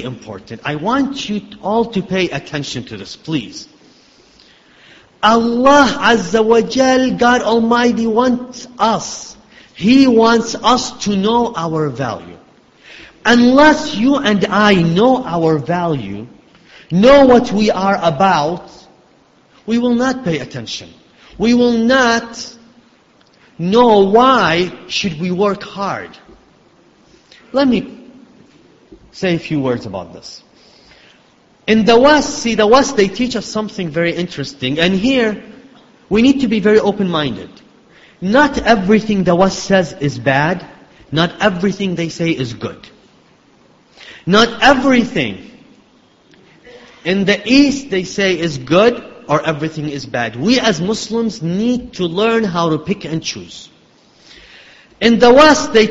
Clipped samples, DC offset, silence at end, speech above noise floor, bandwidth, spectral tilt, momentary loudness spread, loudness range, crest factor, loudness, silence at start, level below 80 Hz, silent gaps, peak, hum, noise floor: under 0.1%; under 0.1%; 0 s; 37 dB; 8 kHz; -5 dB/octave; 15 LU; 8 LU; 14 dB; -14 LUFS; 0 s; -44 dBFS; none; 0 dBFS; none; -50 dBFS